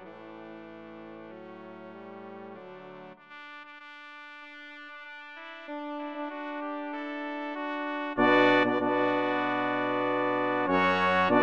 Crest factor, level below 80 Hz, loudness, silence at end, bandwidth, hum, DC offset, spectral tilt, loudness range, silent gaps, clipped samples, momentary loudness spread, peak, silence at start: 20 dB; -76 dBFS; -28 LUFS; 0 s; 7.4 kHz; none; under 0.1%; -6.5 dB/octave; 20 LU; none; under 0.1%; 22 LU; -10 dBFS; 0 s